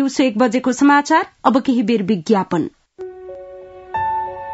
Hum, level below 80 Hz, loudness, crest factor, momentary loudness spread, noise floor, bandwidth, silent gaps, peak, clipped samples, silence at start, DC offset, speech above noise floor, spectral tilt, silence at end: none; -56 dBFS; -17 LUFS; 18 dB; 21 LU; -37 dBFS; 8 kHz; none; 0 dBFS; under 0.1%; 0 s; under 0.1%; 21 dB; -5 dB/octave; 0 s